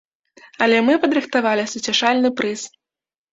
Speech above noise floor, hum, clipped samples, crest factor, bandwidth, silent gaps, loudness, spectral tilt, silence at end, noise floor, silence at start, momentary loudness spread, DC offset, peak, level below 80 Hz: over 72 dB; none; under 0.1%; 18 dB; 8 kHz; none; -18 LUFS; -3 dB/octave; 0.65 s; under -90 dBFS; 0.6 s; 9 LU; under 0.1%; -2 dBFS; -66 dBFS